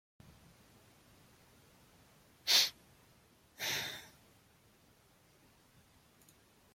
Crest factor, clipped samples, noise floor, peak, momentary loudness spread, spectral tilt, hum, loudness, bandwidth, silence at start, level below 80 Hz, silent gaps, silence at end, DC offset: 28 dB; under 0.1%; -67 dBFS; -16 dBFS; 20 LU; 0.5 dB/octave; none; -32 LUFS; 16.5 kHz; 2.45 s; -76 dBFS; none; 2.65 s; under 0.1%